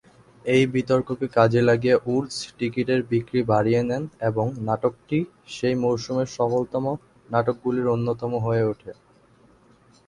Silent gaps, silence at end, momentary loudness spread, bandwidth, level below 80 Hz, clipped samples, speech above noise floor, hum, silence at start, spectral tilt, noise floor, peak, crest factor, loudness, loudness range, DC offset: none; 1.15 s; 8 LU; 11 kHz; -56 dBFS; under 0.1%; 34 dB; none; 0.45 s; -7 dB/octave; -56 dBFS; -4 dBFS; 20 dB; -23 LUFS; 4 LU; under 0.1%